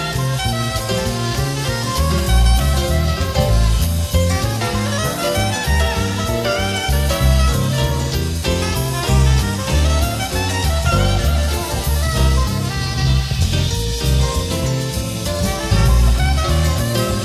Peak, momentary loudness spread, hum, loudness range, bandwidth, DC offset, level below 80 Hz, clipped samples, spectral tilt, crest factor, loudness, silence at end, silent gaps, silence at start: -4 dBFS; 5 LU; none; 1 LU; 15.5 kHz; under 0.1%; -20 dBFS; under 0.1%; -4.5 dB/octave; 12 dB; -18 LUFS; 0 s; none; 0 s